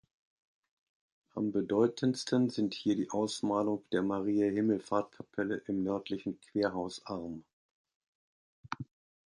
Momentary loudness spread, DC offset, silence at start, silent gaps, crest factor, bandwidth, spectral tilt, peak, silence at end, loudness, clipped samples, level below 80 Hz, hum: 14 LU; under 0.1%; 1.35 s; 7.53-7.85 s, 7.95-8.01 s, 8.08-8.64 s; 18 dB; 11.5 kHz; -6 dB/octave; -16 dBFS; 0.5 s; -33 LUFS; under 0.1%; -70 dBFS; none